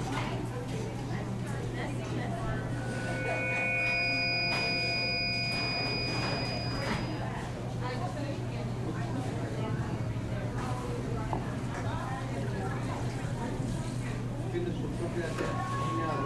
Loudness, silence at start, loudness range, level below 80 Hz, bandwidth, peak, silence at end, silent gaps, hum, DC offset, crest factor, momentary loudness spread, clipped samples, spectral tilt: -32 LUFS; 0 s; 6 LU; -46 dBFS; 12.5 kHz; -18 dBFS; 0 s; none; none; under 0.1%; 14 dB; 8 LU; under 0.1%; -5.5 dB/octave